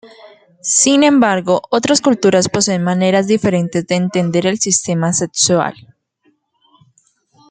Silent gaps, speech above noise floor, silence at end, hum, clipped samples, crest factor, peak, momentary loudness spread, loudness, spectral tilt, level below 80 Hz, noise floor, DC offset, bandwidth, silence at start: none; 46 dB; 1.8 s; none; under 0.1%; 14 dB; 0 dBFS; 6 LU; -14 LUFS; -4 dB/octave; -56 dBFS; -60 dBFS; under 0.1%; 9.6 kHz; 0.05 s